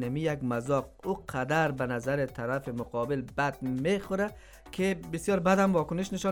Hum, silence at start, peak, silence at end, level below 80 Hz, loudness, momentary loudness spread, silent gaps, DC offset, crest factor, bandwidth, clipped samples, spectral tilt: none; 0 s; -10 dBFS; 0 s; -54 dBFS; -30 LUFS; 8 LU; none; under 0.1%; 18 dB; 18.5 kHz; under 0.1%; -6 dB/octave